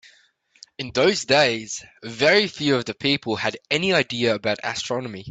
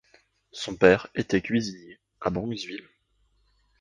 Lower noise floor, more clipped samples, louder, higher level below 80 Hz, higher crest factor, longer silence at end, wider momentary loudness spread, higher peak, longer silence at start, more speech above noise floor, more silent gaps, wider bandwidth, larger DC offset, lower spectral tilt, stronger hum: second, -59 dBFS vs -68 dBFS; neither; first, -21 LUFS vs -26 LUFS; second, -60 dBFS vs -54 dBFS; second, 18 dB vs 24 dB; second, 0 s vs 1.05 s; second, 11 LU vs 20 LU; about the same, -4 dBFS vs -4 dBFS; first, 0.8 s vs 0.55 s; second, 37 dB vs 43 dB; neither; about the same, 9.2 kHz vs 10 kHz; neither; second, -3.5 dB/octave vs -5.5 dB/octave; neither